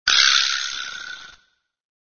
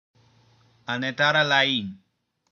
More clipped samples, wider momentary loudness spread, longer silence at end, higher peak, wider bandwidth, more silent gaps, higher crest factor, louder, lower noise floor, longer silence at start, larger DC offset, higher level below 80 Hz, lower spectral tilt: neither; first, 21 LU vs 18 LU; first, 0.8 s vs 0.55 s; first, 0 dBFS vs -6 dBFS; about the same, 7 kHz vs 7.2 kHz; neither; about the same, 22 dB vs 20 dB; first, -17 LUFS vs -22 LUFS; first, -63 dBFS vs -59 dBFS; second, 0.05 s vs 0.9 s; neither; first, -58 dBFS vs -74 dBFS; second, 4 dB/octave vs -4 dB/octave